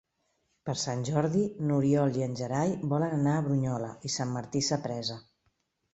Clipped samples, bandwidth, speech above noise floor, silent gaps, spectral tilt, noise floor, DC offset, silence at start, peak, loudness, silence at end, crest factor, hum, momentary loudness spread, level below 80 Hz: under 0.1%; 8.2 kHz; 47 dB; none; -6 dB/octave; -76 dBFS; under 0.1%; 0.65 s; -12 dBFS; -30 LUFS; 0.75 s; 18 dB; none; 9 LU; -64 dBFS